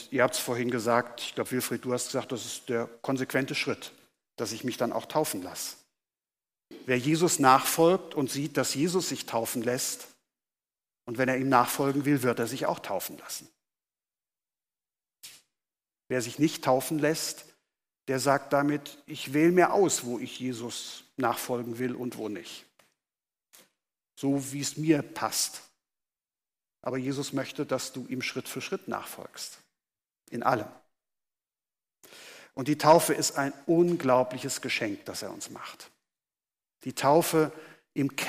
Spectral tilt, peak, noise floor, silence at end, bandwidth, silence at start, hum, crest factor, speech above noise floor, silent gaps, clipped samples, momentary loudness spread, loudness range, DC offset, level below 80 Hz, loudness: -4 dB/octave; -8 dBFS; under -90 dBFS; 0 s; 15.5 kHz; 0 s; none; 22 dB; over 62 dB; none; under 0.1%; 17 LU; 9 LU; under 0.1%; -74 dBFS; -28 LUFS